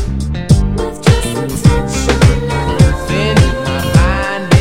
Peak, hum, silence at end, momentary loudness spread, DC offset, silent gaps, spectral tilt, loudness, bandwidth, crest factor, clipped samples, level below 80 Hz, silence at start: 0 dBFS; none; 0 s; 6 LU; under 0.1%; none; -6 dB/octave; -13 LUFS; 16.5 kHz; 12 dB; 0.4%; -18 dBFS; 0 s